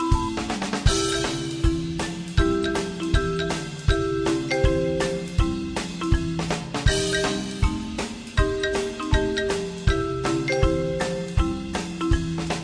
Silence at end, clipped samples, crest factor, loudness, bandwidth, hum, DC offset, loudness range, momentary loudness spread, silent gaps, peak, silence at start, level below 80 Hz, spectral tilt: 0 s; under 0.1%; 20 dB; -25 LUFS; 10.5 kHz; none; under 0.1%; 1 LU; 5 LU; none; -4 dBFS; 0 s; -30 dBFS; -5 dB/octave